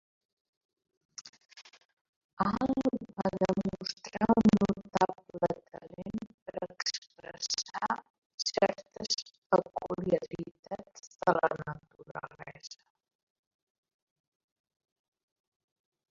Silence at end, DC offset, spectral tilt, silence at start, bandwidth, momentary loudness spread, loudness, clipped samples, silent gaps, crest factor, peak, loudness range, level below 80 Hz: 3.35 s; under 0.1%; -5 dB/octave; 1.2 s; 7.6 kHz; 20 LU; -32 LUFS; under 0.1%; 1.21-1.33 s, 1.85-2.37 s, 6.34-6.46 s, 6.98-7.02 s, 8.10-8.38 s, 9.38-9.50 s, 10.59-10.63 s; 26 dB; -8 dBFS; 7 LU; -62 dBFS